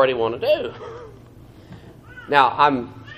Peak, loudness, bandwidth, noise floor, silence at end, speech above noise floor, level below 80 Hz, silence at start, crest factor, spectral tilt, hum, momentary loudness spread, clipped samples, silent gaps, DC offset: 0 dBFS; -19 LUFS; 14.5 kHz; -44 dBFS; 0 s; 25 dB; -54 dBFS; 0 s; 22 dB; -6 dB/octave; none; 21 LU; under 0.1%; none; under 0.1%